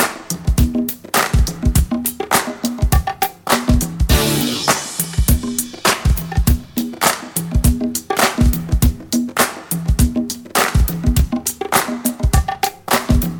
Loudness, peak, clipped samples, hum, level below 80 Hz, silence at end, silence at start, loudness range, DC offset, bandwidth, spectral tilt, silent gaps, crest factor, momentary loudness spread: -17 LUFS; 0 dBFS; under 0.1%; none; -20 dBFS; 0 s; 0 s; 1 LU; under 0.1%; over 20 kHz; -4.5 dB/octave; none; 16 dB; 5 LU